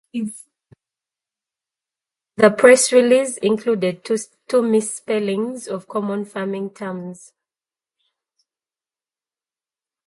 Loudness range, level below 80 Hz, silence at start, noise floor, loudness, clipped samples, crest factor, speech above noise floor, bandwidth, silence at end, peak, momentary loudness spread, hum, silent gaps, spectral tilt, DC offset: 15 LU; -70 dBFS; 0.15 s; under -90 dBFS; -18 LUFS; under 0.1%; 20 dB; over 72 dB; 11.5 kHz; 2.95 s; 0 dBFS; 17 LU; none; none; -4 dB/octave; under 0.1%